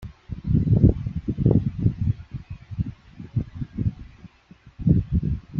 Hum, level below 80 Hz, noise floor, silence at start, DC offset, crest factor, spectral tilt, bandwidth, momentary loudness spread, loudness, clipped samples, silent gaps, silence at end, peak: none; -34 dBFS; -51 dBFS; 0 s; under 0.1%; 20 dB; -12 dB/octave; 4.6 kHz; 18 LU; -24 LUFS; under 0.1%; none; 0 s; -4 dBFS